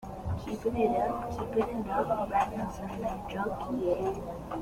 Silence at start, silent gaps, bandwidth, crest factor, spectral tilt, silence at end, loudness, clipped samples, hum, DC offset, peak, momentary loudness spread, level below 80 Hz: 0 s; none; 16.5 kHz; 18 dB; -7 dB/octave; 0 s; -32 LUFS; under 0.1%; none; under 0.1%; -14 dBFS; 8 LU; -48 dBFS